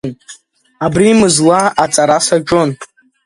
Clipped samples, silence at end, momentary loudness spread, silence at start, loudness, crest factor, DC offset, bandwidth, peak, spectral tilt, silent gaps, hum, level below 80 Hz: under 0.1%; 0.4 s; 11 LU; 0.05 s; -11 LUFS; 12 dB; under 0.1%; 11.5 kHz; 0 dBFS; -4 dB/octave; none; none; -46 dBFS